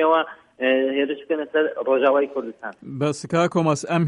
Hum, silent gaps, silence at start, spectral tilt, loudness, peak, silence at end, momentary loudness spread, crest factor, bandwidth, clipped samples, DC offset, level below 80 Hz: none; none; 0 s; -6 dB/octave; -22 LUFS; -6 dBFS; 0 s; 12 LU; 16 dB; 11 kHz; under 0.1%; under 0.1%; -66 dBFS